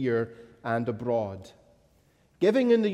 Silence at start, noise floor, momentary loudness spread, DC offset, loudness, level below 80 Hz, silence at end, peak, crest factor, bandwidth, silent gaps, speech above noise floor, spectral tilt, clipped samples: 0 s; -64 dBFS; 15 LU; under 0.1%; -27 LUFS; -68 dBFS; 0 s; -12 dBFS; 16 dB; 11 kHz; none; 38 dB; -7.5 dB/octave; under 0.1%